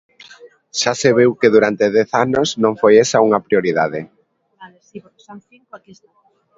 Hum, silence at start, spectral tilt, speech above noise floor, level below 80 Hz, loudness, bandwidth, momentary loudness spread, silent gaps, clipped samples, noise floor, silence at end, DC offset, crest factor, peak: none; 0.45 s; -4.5 dB/octave; 34 dB; -58 dBFS; -15 LUFS; 7.8 kHz; 8 LU; none; under 0.1%; -49 dBFS; 0.8 s; under 0.1%; 16 dB; 0 dBFS